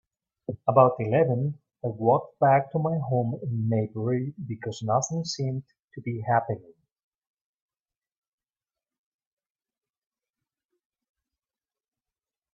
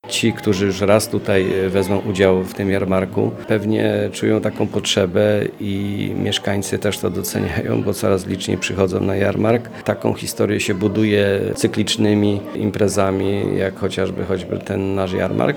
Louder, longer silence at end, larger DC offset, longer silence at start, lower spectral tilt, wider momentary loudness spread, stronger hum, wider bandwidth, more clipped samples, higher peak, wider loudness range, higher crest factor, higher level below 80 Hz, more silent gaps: second, -26 LUFS vs -19 LUFS; first, 5.95 s vs 0 s; neither; first, 0.5 s vs 0.05 s; about the same, -6.5 dB/octave vs -5.5 dB/octave; first, 14 LU vs 6 LU; neither; second, 7.8 kHz vs 20 kHz; neither; second, -4 dBFS vs 0 dBFS; first, 10 LU vs 2 LU; first, 26 dB vs 18 dB; second, -68 dBFS vs -50 dBFS; first, 5.84-5.88 s vs none